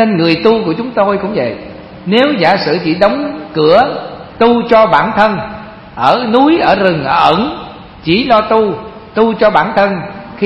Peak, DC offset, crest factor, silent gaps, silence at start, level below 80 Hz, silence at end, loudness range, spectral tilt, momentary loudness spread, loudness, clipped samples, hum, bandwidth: 0 dBFS; under 0.1%; 12 dB; none; 0 s; -42 dBFS; 0 s; 2 LU; -7.5 dB/octave; 16 LU; -11 LUFS; 0.3%; none; 8.6 kHz